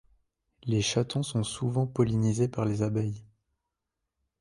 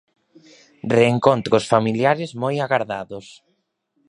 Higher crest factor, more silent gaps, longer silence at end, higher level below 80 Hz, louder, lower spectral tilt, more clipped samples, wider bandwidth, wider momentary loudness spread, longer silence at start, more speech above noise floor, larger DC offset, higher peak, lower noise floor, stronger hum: about the same, 18 dB vs 20 dB; neither; first, 1.15 s vs 0.75 s; about the same, -56 dBFS vs -60 dBFS; second, -29 LUFS vs -19 LUFS; about the same, -6 dB/octave vs -6 dB/octave; neither; about the same, 11.5 kHz vs 10.5 kHz; second, 6 LU vs 15 LU; second, 0.65 s vs 0.85 s; first, 58 dB vs 51 dB; neither; second, -12 dBFS vs 0 dBFS; first, -85 dBFS vs -70 dBFS; neither